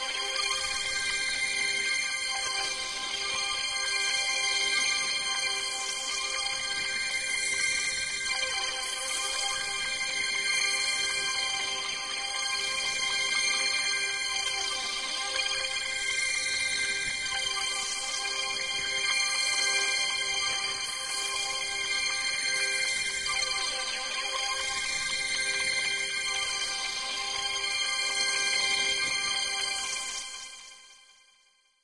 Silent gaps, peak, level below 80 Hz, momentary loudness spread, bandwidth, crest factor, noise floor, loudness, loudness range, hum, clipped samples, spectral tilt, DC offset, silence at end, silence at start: none; -14 dBFS; -60 dBFS; 5 LU; 11.5 kHz; 16 dB; -66 dBFS; -27 LUFS; 1 LU; none; under 0.1%; 2 dB/octave; under 0.1%; 0.8 s; 0 s